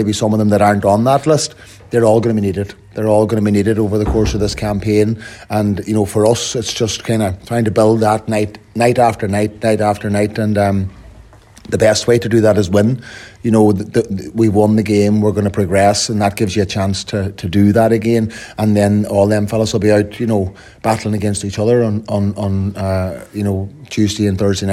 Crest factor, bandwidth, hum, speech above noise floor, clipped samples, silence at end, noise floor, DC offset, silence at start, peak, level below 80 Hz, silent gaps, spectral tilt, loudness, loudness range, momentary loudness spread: 14 dB; 14.5 kHz; none; 27 dB; under 0.1%; 0 s; -41 dBFS; under 0.1%; 0 s; 0 dBFS; -38 dBFS; none; -6 dB/octave; -15 LUFS; 2 LU; 8 LU